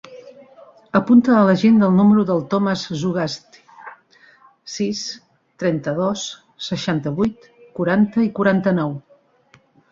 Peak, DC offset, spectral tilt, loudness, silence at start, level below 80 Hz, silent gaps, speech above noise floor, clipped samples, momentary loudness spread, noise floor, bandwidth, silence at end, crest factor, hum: -2 dBFS; under 0.1%; -6.5 dB/octave; -18 LUFS; 0.1 s; -58 dBFS; none; 38 dB; under 0.1%; 17 LU; -55 dBFS; 7.6 kHz; 0.95 s; 16 dB; none